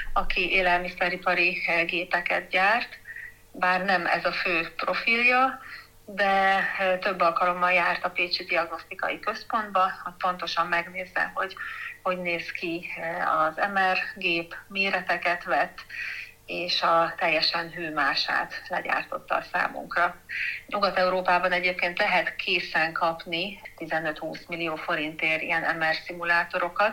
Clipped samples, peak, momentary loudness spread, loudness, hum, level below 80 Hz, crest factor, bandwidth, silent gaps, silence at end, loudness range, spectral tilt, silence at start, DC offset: under 0.1%; -8 dBFS; 10 LU; -25 LUFS; none; -48 dBFS; 18 dB; 17 kHz; none; 0 s; 4 LU; -4 dB/octave; 0 s; under 0.1%